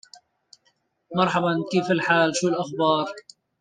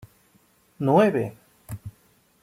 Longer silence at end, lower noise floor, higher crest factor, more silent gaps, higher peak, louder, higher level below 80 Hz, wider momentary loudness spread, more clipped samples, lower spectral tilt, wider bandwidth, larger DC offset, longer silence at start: second, 0.4 s vs 0.55 s; first, -68 dBFS vs -61 dBFS; about the same, 20 dB vs 20 dB; neither; about the same, -6 dBFS vs -6 dBFS; about the same, -23 LUFS vs -22 LUFS; second, -68 dBFS vs -60 dBFS; second, 9 LU vs 21 LU; neither; second, -4.5 dB/octave vs -8 dB/octave; second, 9.8 kHz vs 16 kHz; neither; first, 1.1 s vs 0.8 s